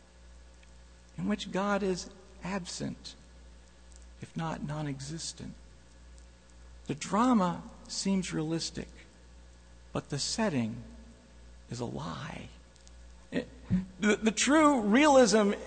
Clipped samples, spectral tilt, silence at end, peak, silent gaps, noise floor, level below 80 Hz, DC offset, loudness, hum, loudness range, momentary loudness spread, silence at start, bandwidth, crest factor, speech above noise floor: under 0.1%; -4.5 dB/octave; 0 s; -10 dBFS; none; -55 dBFS; -54 dBFS; under 0.1%; -30 LUFS; none; 11 LU; 22 LU; 0.25 s; 9.4 kHz; 22 dB; 25 dB